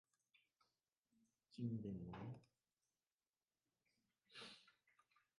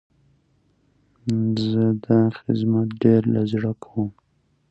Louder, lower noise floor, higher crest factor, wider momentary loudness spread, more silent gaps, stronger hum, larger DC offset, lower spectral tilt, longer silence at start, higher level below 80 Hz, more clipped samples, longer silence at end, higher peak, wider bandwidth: second, -53 LUFS vs -22 LUFS; first, under -90 dBFS vs -65 dBFS; about the same, 22 dB vs 20 dB; first, 15 LU vs 10 LU; first, 3.13-3.18 s vs none; neither; neither; second, -7 dB/octave vs -9 dB/octave; first, 1.5 s vs 1.25 s; second, -80 dBFS vs -58 dBFS; neither; about the same, 0.7 s vs 0.6 s; second, -34 dBFS vs -2 dBFS; first, 11 kHz vs 8 kHz